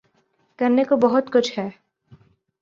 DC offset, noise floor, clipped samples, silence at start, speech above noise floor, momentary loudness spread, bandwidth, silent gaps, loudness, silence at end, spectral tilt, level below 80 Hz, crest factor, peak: under 0.1%; -65 dBFS; under 0.1%; 0.6 s; 46 dB; 12 LU; 7.6 kHz; none; -20 LUFS; 0.9 s; -5.5 dB/octave; -66 dBFS; 18 dB; -4 dBFS